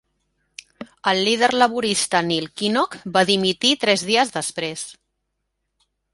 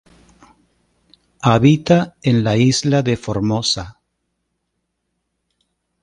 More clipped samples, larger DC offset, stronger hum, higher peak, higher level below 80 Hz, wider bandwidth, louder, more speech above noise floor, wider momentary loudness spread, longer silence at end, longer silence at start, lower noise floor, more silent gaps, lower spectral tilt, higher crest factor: neither; neither; neither; about the same, -2 dBFS vs 0 dBFS; second, -62 dBFS vs -48 dBFS; about the same, 11.5 kHz vs 10.5 kHz; second, -19 LUFS vs -16 LUFS; about the same, 56 dB vs 58 dB; first, 10 LU vs 7 LU; second, 1.2 s vs 2.1 s; second, 0.8 s vs 1.45 s; about the same, -76 dBFS vs -73 dBFS; neither; second, -3 dB/octave vs -5.5 dB/octave; about the same, 20 dB vs 18 dB